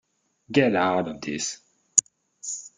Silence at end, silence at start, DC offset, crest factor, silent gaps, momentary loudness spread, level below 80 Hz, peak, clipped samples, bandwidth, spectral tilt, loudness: 0.1 s; 0.5 s; under 0.1%; 26 dB; none; 12 LU; -66 dBFS; -2 dBFS; under 0.1%; 9.8 kHz; -3 dB/octave; -24 LUFS